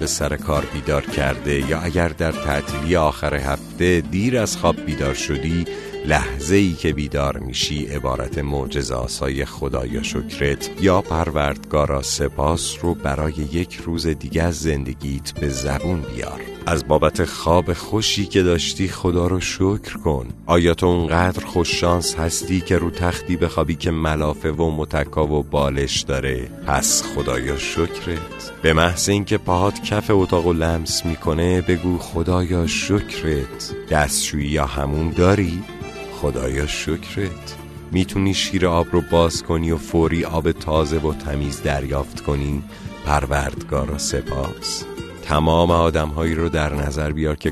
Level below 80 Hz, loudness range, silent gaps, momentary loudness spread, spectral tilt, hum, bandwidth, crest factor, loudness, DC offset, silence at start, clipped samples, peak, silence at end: -32 dBFS; 4 LU; none; 8 LU; -5 dB/octave; none; 13.5 kHz; 20 dB; -20 LUFS; under 0.1%; 0 s; under 0.1%; 0 dBFS; 0 s